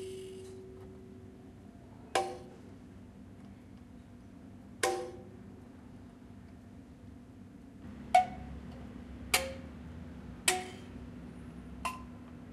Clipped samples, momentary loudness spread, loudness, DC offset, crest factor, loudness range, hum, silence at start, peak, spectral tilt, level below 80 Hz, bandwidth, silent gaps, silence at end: under 0.1%; 21 LU; -36 LUFS; under 0.1%; 30 dB; 9 LU; none; 0 s; -10 dBFS; -3 dB/octave; -56 dBFS; 15.5 kHz; none; 0 s